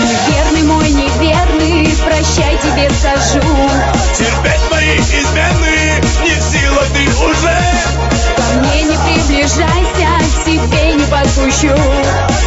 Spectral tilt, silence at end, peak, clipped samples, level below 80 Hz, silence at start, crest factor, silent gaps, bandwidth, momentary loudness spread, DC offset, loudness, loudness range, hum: -4.5 dB/octave; 0 s; 0 dBFS; under 0.1%; -16 dBFS; 0 s; 10 dB; none; 8 kHz; 2 LU; under 0.1%; -11 LUFS; 0 LU; none